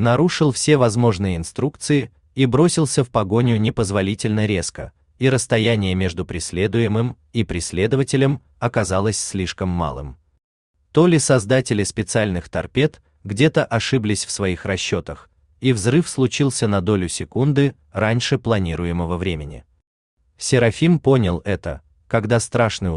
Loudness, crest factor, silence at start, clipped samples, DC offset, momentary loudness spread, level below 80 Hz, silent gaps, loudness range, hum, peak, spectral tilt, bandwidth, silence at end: -19 LUFS; 16 dB; 0 s; under 0.1%; under 0.1%; 9 LU; -44 dBFS; 10.44-10.74 s, 19.87-20.17 s; 3 LU; none; -2 dBFS; -5.5 dB/octave; 12.5 kHz; 0 s